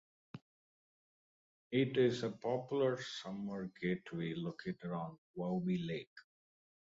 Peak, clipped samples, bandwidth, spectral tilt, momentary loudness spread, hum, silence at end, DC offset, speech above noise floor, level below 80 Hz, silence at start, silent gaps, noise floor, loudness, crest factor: -20 dBFS; under 0.1%; 7.6 kHz; -5.5 dB/octave; 14 LU; none; 0.65 s; under 0.1%; over 52 dB; -76 dBFS; 0.35 s; 0.42-1.70 s, 5.18-5.34 s, 6.07-6.16 s; under -90 dBFS; -39 LUFS; 20 dB